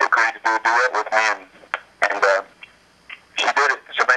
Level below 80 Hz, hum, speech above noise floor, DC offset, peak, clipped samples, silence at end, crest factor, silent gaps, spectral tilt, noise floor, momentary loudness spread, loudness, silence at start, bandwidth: -70 dBFS; none; 28 dB; under 0.1%; -2 dBFS; under 0.1%; 0 s; 18 dB; none; 0 dB/octave; -47 dBFS; 13 LU; -19 LUFS; 0 s; 11.5 kHz